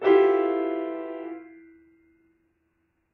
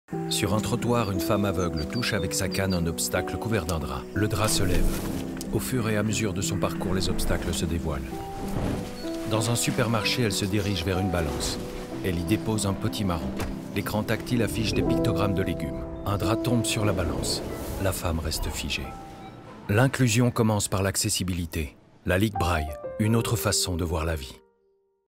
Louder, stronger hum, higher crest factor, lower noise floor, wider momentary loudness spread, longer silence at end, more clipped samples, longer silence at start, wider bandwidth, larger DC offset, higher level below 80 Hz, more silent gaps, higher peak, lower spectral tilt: about the same, -25 LUFS vs -27 LUFS; neither; about the same, 18 dB vs 20 dB; first, -73 dBFS vs -68 dBFS; first, 19 LU vs 8 LU; first, 1.65 s vs 0.7 s; neither; about the same, 0 s vs 0.1 s; second, 4.2 kHz vs 16 kHz; neither; second, -76 dBFS vs -38 dBFS; neither; about the same, -8 dBFS vs -6 dBFS; second, -2.5 dB/octave vs -4.5 dB/octave